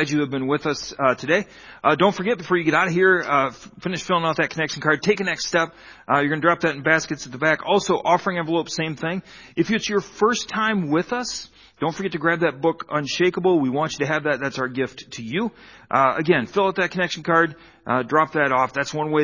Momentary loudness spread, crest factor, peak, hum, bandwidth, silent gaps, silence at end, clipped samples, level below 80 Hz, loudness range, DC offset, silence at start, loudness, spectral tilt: 9 LU; 20 dB; -2 dBFS; none; 7.4 kHz; none; 0 s; under 0.1%; -58 dBFS; 3 LU; under 0.1%; 0 s; -21 LUFS; -5 dB/octave